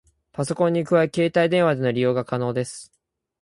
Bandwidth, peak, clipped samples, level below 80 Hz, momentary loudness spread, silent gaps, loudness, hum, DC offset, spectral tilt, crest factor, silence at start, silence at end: 11.5 kHz; -6 dBFS; under 0.1%; -62 dBFS; 12 LU; none; -22 LUFS; none; under 0.1%; -6 dB/octave; 16 dB; 0.4 s; 0.55 s